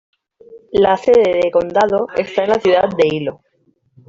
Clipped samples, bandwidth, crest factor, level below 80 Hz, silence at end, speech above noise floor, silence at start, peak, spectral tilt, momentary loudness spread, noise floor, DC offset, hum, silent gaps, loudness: under 0.1%; 7.6 kHz; 14 dB; -50 dBFS; 0.75 s; 46 dB; 0.5 s; -2 dBFS; -6 dB/octave; 7 LU; -60 dBFS; under 0.1%; none; none; -15 LUFS